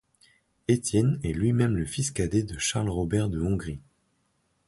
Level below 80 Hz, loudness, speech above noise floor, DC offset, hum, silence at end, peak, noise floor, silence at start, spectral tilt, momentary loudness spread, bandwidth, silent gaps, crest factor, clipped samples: -44 dBFS; -27 LUFS; 46 dB; under 0.1%; none; 0.9 s; -10 dBFS; -72 dBFS; 0.7 s; -5.5 dB/octave; 6 LU; 11.5 kHz; none; 18 dB; under 0.1%